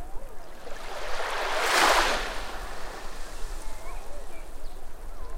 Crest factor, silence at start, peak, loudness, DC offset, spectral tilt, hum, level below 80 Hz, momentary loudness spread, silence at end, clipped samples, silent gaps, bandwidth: 18 dB; 0 s; -8 dBFS; -26 LUFS; under 0.1%; -1.5 dB/octave; none; -36 dBFS; 24 LU; 0 s; under 0.1%; none; 16 kHz